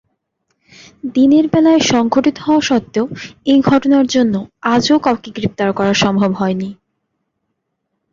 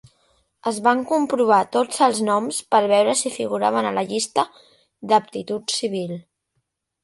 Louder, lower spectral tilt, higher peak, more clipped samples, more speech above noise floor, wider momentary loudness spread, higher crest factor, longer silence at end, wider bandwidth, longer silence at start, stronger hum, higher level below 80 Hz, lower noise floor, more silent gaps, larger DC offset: first, -14 LUFS vs -20 LUFS; first, -5 dB/octave vs -3.5 dB/octave; about the same, -2 dBFS vs -4 dBFS; neither; first, 59 dB vs 54 dB; about the same, 10 LU vs 11 LU; about the same, 14 dB vs 18 dB; first, 1.4 s vs 0.85 s; second, 7.6 kHz vs 11.5 kHz; first, 1.05 s vs 0.65 s; neither; first, -50 dBFS vs -70 dBFS; about the same, -72 dBFS vs -74 dBFS; neither; neither